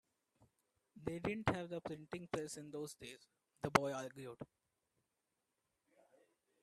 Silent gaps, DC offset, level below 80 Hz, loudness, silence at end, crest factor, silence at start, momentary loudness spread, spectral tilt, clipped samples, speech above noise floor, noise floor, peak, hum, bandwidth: none; under 0.1%; -72 dBFS; -43 LUFS; 2.2 s; 34 dB; 0.4 s; 18 LU; -5 dB/octave; under 0.1%; 45 dB; -88 dBFS; -12 dBFS; none; 14 kHz